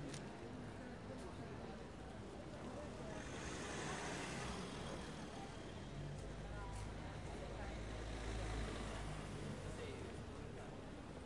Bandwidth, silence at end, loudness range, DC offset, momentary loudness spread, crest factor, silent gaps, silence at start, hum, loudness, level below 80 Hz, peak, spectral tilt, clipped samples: 11.5 kHz; 0 s; 2 LU; under 0.1%; 7 LU; 14 dB; none; 0 s; none; -49 LUFS; -56 dBFS; -34 dBFS; -5 dB/octave; under 0.1%